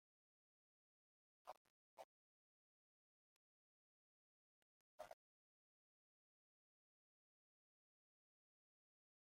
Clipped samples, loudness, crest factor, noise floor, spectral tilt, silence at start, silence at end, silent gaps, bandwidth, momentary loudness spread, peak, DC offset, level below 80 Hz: under 0.1%; -65 LUFS; 30 dB; under -90 dBFS; 7 dB/octave; 1.45 s; 4.05 s; 1.57-1.97 s, 2.04-4.98 s; 1.8 kHz; 5 LU; -42 dBFS; under 0.1%; under -90 dBFS